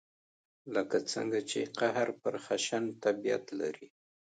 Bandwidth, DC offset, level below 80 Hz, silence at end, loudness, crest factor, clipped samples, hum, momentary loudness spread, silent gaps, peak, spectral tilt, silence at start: 9.4 kHz; under 0.1%; -82 dBFS; 0.35 s; -34 LUFS; 20 dB; under 0.1%; none; 7 LU; none; -14 dBFS; -3.5 dB/octave; 0.65 s